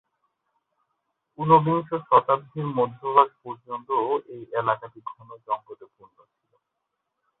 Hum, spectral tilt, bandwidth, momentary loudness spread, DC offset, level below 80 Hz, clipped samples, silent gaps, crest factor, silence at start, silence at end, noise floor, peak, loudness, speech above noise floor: none; -11 dB/octave; 4.1 kHz; 19 LU; under 0.1%; -68 dBFS; under 0.1%; none; 22 dB; 1.4 s; 1.65 s; -81 dBFS; -4 dBFS; -23 LUFS; 56 dB